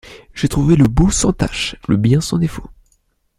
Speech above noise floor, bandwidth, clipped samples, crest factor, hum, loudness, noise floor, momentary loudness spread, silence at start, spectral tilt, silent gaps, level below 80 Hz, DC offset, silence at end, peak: 47 dB; 15 kHz; under 0.1%; 16 dB; none; -16 LUFS; -61 dBFS; 10 LU; 0.1 s; -5.5 dB/octave; none; -28 dBFS; under 0.1%; 0.7 s; -2 dBFS